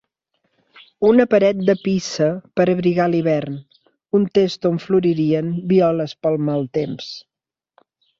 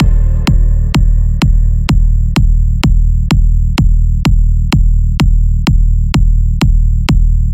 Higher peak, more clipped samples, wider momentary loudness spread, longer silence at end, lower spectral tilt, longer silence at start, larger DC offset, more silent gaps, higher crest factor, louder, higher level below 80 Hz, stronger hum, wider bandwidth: about the same, -2 dBFS vs 0 dBFS; neither; first, 9 LU vs 1 LU; first, 1 s vs 0 s; about the same, -7 dB/octave vs -6.5 dB/octave; first, 1 s vs 0 s; second, under 0.1% vs 0.2%; neither; first, 16 dB vs 8 dB; second, -18 LUFS vs -13 LUFS; second, -58 dBFS vs -10 dBFS; neither; second, 7.6 kHz vs 8.6 kHz